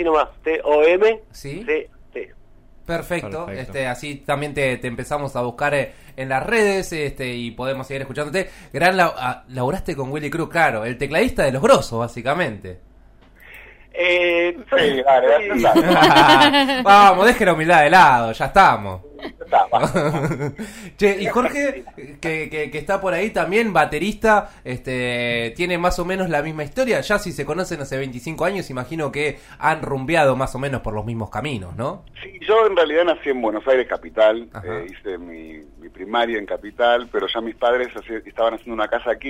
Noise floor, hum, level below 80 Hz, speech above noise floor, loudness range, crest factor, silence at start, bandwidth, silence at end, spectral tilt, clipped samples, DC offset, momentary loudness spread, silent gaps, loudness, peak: -48 dBFS; none; -42 dBFS; 29 dB; 10 LU; 16 dB; 0 s; 16 kHz; 0 s; -5 dB/octave; under 0.1%; under 0.1%; 16 LU; none; -18 LUFS; -2 dBFS